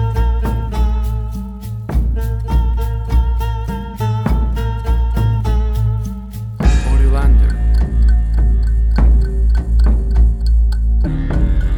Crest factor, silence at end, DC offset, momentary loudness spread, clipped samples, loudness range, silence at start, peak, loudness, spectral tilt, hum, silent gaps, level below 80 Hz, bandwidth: 12 dB; 0 s; under 0.1%; 7 LU; under 0.1%; 4 LU; 0 s; -2 dBFS; -17 LUFS; -8 dB/octave; none; none; -14 dBFS; 5.6 kHz